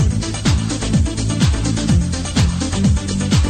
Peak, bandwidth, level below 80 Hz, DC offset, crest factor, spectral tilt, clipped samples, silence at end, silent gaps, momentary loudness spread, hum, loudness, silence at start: -4 dBFS; 12 kHz; -22 dBFS; under 0.1%; 12 dB; -5 dB/octave; under 0.1%; 0 s; none; 2 LU; none; -18 LUFS; 0 s